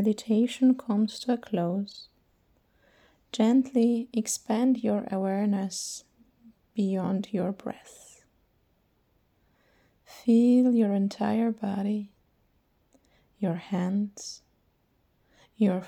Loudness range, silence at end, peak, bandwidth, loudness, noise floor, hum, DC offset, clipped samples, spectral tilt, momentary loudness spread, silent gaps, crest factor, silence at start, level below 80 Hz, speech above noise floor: 8 LU; 0 s; -12 dBFS; 14 kHz; -27 LUFS; -69 dBFS; none; under 0.1%; under 0.1%; -6 dB/octave; 15 LU; none; 16 dB; 0 s; -72 dBFS; 43 dB